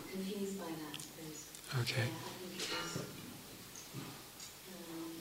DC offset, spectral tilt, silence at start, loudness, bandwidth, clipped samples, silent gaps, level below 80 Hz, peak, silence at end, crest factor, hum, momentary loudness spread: under 0.1%; -4 dB/octave; 0 s; -43 LUFS; 16 kHz; under 0.1%; none; -72 dBFS; -22 dBFS; 0 s; 22 dB; none; 12 LU